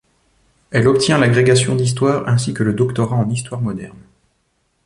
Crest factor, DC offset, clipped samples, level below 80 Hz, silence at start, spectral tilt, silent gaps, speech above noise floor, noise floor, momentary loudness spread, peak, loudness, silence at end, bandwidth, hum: 14 dB; under 0.1%; under 0.1%; -48 dBFS; 0.7 s; -5.5 dB/octave; none; 49 dB; -65 dBFS; 11 LU; -2 dBFS; -16 LUFS; 0.95 s; 11.5 kHz; none